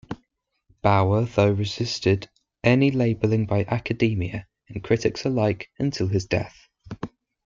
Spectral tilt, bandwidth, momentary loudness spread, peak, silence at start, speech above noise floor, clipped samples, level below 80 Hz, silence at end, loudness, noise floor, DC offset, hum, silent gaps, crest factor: -7 dB/octave; 7.6 kHz; 18 LU; -4 dBFS; 0.1 s; 50 dB; under 0.1%; -52 dBFS; 0.4 s; -23 LUFS; -72 dBFS; under 0.1%; none; none; 20 dB